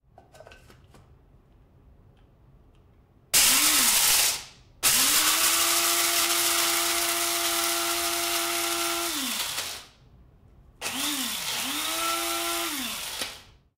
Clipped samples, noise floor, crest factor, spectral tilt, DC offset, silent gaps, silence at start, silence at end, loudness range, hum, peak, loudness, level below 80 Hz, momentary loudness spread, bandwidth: under 0.1%; -58 dBFS; 18 dB; 1 dB/octave; under 0.1%; none; 0.35 s; 0.35 s; 9 LU; none; -10 dBFS; -23 LUFS; -58 dBFS; 13 LU; 16 kHz